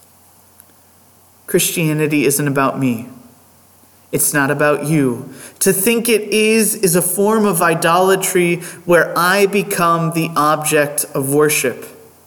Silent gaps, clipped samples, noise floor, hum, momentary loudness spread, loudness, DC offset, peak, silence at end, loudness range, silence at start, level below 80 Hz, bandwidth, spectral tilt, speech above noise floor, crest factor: none; under 0.1%; -49 dBFS; none; 7 LU; -15 LUFS; under 0.1%; -2 dBFS; 0.35 s; 5 LU; 1.5 s; -58 dBFS; 19 kHz; -4 dB/octave; 34 dB; 14 dB